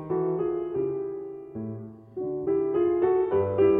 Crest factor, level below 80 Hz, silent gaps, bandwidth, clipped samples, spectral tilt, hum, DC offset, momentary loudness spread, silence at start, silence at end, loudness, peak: 14 dB; -60 dBFS; none; 3.2 kHz; under 0.1%; -11.5 dB/octave; none; under 0.1%; 14 LU; 0 s; 0 s; -27 LUFS; -12 dBFS